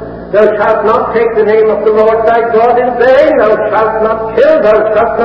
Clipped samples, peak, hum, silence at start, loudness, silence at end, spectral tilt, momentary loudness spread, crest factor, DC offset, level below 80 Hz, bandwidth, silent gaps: 1%; 0 dBFS; none; 0 s; -8 LUFS; 0 s; -7.5 dB/octave; 4 LU; 8 dB; 0.3%; -38 dBFS; 5.8 kHz; none